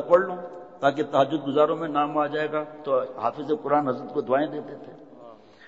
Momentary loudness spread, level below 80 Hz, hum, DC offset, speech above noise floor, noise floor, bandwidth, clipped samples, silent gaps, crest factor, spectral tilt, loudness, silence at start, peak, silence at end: 14 LU; -72 dBFS; none; 0.1%; 23 dB; -48 dBFS; 7.6 kHz; under 0.1%; none; 20 dB; -7 dB/octave; -25 LUFS; 0 s; -6 dBFS; 0 s